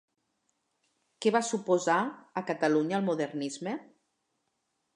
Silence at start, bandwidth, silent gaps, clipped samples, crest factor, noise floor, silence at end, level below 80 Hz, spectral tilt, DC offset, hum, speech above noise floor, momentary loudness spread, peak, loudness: 1.2 s; 11 kHz; none; under 0.1%; 20 dB; -79 dBFS; 1.15 s; -86 dBFS; -5 dB/octave; under 0.1%; none; 50 dB; 10 LU; -12 dBFS; -30 LUFS